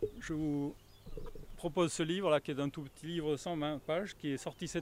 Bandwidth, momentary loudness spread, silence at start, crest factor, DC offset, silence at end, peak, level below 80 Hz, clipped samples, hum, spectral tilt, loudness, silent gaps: 16 kHz; 17 LU; 0 s; 20 dB; under 0.1%; 0 s; -16 dBFS; -54 dBFS; under 0.1%; none; -5.5 dB/octave; -37 LUFS; none